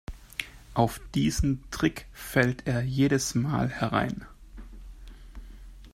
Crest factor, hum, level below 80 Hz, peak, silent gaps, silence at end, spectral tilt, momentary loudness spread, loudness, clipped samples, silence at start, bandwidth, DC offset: 22 dB; none; -42 dBFS; -8 dBFS; none; 0.05 s; -5.5 dB/octave; 24 LU; -28 LUFS; under 0.1%; 0.1 s; 16 kHz; under 0.1%